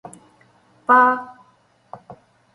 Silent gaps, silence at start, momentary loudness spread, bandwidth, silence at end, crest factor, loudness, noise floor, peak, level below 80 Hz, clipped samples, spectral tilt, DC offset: none; 0.9 s; 27 LU; 11.5 kHz; 0.4 s; 20 dB; -17 LUFS; -58 dBFS; -2 dBFS; -72 dBFS; under 0.1%; -5 dB/octave; under 0.1%